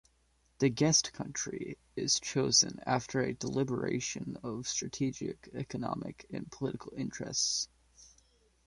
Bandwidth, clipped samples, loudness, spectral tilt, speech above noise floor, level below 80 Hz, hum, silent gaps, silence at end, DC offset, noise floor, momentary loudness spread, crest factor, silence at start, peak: 11.5 kHz; under 0.1%; -33 LUFS; -3 dB/octave; 37 dB; -64 dBFS; none; none; 0.6 s; under 0.1%; -71 dBFS; 15 LU; 24 dB; 0.6 s; -12 dBFS